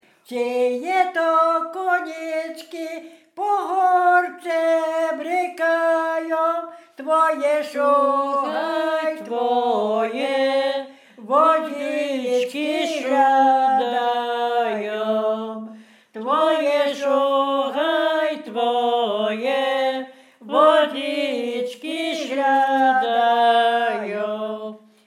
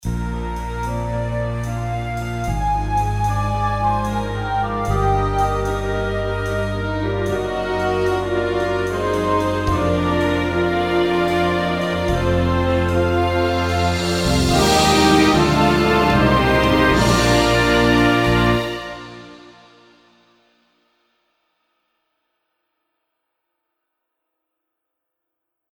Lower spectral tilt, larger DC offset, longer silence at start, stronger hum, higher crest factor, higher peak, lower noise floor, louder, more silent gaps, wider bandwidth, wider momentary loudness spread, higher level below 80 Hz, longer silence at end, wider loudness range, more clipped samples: second, -3.5 dB/octave vs -5.5 dB/octave; neither; first, 0.3 s vs 0.05 s; neither; about the same, 16 dB vs 18 dB; about the same, -4 dBFS vs -2 dBFS; second, -43 dBFS vs -80 dBFS; about the same, -20 LUFS vs -18 LUFS; neither; second, 15 kHz vs 17 kHz; about the same, 11 LU vs 10 LU; second, under -90 dBFS vs -30 dBFS; second, 0.3 s vs 6.25 s; second, 2 LU vs 7 LU; neither